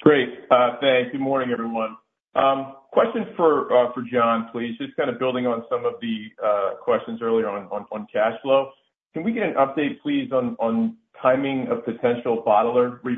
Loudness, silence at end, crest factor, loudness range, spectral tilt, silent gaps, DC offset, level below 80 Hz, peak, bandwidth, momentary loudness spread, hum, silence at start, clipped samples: -22 LUFS; 0 s; 20 dB; 3 LU; -8.5 dB/octave; none; under 0.1%; -70 dBFS; -2 dBFS; 3.9 kHz; 10 LU; none; 0 s; under 0.1%